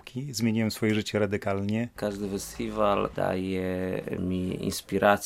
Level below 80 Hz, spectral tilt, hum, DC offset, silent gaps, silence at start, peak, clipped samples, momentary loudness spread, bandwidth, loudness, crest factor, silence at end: -54 dBFS; -5.5 dB/octave; none; under 0.1%; none; 0.05 s; -6 dBFS; under 0.1%; 7 LU; 16 kHz; -29 LUFS; 22 dB; 0 s